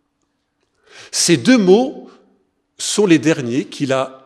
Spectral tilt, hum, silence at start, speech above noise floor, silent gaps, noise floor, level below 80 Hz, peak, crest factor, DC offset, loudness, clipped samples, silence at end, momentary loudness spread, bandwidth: -4 dB/octave; none; 0.95 s; 54 dB; none; -69 dBFS; -68 dBFS; 0 dBFS; 18 dB; under 0.1%; -15 LUFS; under 0.1%; 0.1 s; 12 LU; 14 kHz